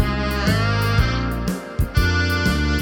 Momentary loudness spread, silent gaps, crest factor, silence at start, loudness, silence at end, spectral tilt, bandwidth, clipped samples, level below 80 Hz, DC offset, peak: 6 LU; none; 14 dB; 0 s; -20 LUFS; 0 s; -5.5 dB/octave; 18 kHz; under 0.1%; -26 dBFS; under 0.1%; -4 dBFS